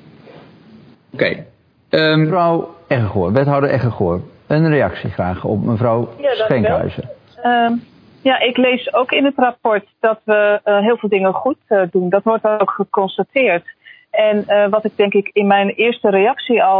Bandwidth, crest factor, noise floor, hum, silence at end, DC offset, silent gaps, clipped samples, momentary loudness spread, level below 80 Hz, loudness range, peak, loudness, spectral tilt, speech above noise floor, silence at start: 5.2 kHz; 16 dB; -44 dBFS; none; 0 s; under 0.1%; none; under 0.1%; 7 LU; -50 dBFS; 2 LU; 0 dBFS; -16 LUFS; -9.5 dB/octave; 29 dB; 0.35 s